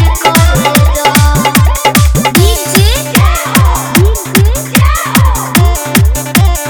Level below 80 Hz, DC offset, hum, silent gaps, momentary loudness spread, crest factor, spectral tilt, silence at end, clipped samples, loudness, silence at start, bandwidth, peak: -12 dBFS; under 0.1%; none; none; 2 LU; 8 dB; -4.5 dB/octave; 0 s; 1%; -8 LUFS; 0 s; over 20 kHz; 0 dBFS